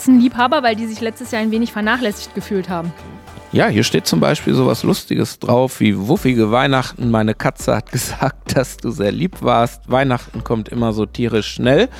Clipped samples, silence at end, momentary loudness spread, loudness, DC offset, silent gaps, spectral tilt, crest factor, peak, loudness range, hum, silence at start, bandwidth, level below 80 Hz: under 0.1%; 0 s; 8 LU; -17 LUFS; under 0.1%; none; -5.5 dB/octave; 16 dB; 0 dBFS; 3 LU; none; 0 s; 16.5 kHz; -40 dBFS